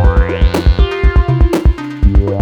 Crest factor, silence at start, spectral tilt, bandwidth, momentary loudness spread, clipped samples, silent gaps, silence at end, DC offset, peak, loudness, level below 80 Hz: 10 dB; 0 s; -7.5 dB/octave; 8.4 kHz; 2 LU; under 0.1%; none; 0 s; under 0.1%; -2 dBFS; -13 LUFS; -12 dBFS